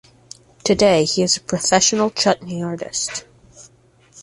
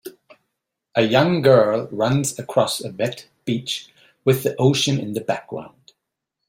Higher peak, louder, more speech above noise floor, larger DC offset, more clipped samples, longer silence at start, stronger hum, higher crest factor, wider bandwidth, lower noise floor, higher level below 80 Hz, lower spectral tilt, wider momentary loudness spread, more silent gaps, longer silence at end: about the same, -2 dBFS vs -2 dBFS; about the same, -18 LUFS vs -20 LUFS; second, 35 dB vs 61 dB; neither; neither; first, 0.65 s vs 0.05 s; neither; about the same, 18 dB vs 20 dB; second, 11.5 kHz vs 16 kHz; second, -53 dBFS vs -80 dBFS; first, -52 dBFS vs -60 dBFS; second, -3 dB/octave vs -5 dB/octave; about the same, 11 LU vs 13 LU; neither; second, 0 s vs 0.8 s